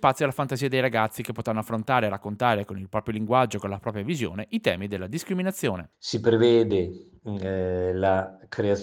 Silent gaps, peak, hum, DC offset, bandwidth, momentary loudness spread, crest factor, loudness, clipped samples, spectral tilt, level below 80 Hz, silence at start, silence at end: none; -6 dBFS; none; under 0.1%; 18.5 kHz; 10 LU; 20 dB; -26 LUFS; under 0.1%; -6 dB/octave; -62 dBFS; 0 s; 0 s